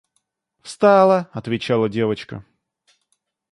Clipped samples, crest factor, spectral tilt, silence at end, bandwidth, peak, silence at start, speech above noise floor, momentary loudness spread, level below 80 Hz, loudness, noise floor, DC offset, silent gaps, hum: under 0.1%; 18 dB; -6.5 dB/octave; 1.1 s; 11.5 kHz; -2 dBFS; 0.65 s; 54 dB; 22 LU; -60 dBFS; -18 LUFS; -72 dBFS; under 0.1%; none; none